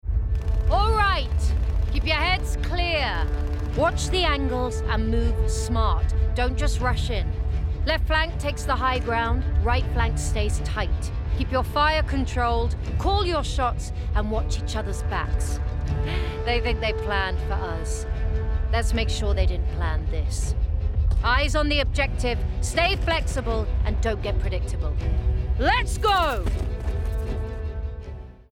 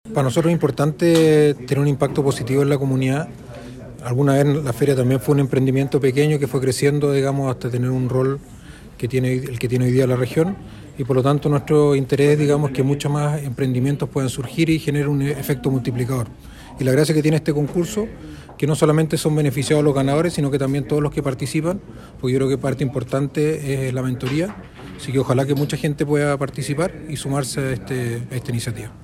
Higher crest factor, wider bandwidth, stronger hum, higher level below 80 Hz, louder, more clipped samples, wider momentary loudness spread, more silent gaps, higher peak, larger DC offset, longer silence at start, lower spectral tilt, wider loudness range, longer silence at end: about the same, 14 dB vs 18 dB; second, 13 kHz vs 15.5 kHz; neither; first, -26 dBFS vs -46 dBFS; second, -25 LUFS vs -20 LUFS; neither; second, 6 LU vs 9 LU; neither; second, -10 dBFS vs 0 dBFS; neither; about the same, 0.05 s vs 0.05 s; second, -5 dB/octave vs -6.5 dB/octave; about the same, 3 LU vs 4 LU; about the same, 0.1 s vs 0 s